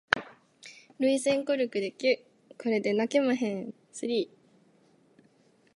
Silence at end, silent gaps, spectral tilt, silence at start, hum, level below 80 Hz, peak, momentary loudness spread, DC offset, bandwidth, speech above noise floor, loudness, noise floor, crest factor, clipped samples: 1.5 s; none; -4 dB/octave; 0.15 s; none; -70 dBFS; -4 dBFS; 16 LU; under 0.1%; 11.5 kHz; 36 dB; -29 LUFS; -64 dBFS; 26 dB; under 0.1%